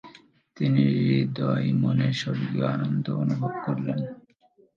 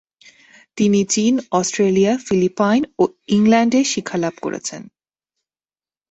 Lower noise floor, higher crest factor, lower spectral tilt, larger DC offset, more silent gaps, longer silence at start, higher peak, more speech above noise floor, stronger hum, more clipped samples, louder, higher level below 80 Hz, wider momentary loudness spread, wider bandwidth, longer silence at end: second, -61 dBFS vs under -90 dBFS; about the same, 16 dB vs 16 dB; first, -8 dB/octave vs -5 dB/octave; neither; neither; second, 0.05 s vs 0.75 s; second, -8 dBFS vs -2 dBFS; second, 37 dB vs over 73 dB; neither; neither; second, -25 LUFS vs -17 LUFS; second, -66 dBFS vs -58 dBFS; second, 7 LU vs 11 LU; second, 7.4 kHz vs 8.2 kHz; second, 0.6 s vs 1.3 s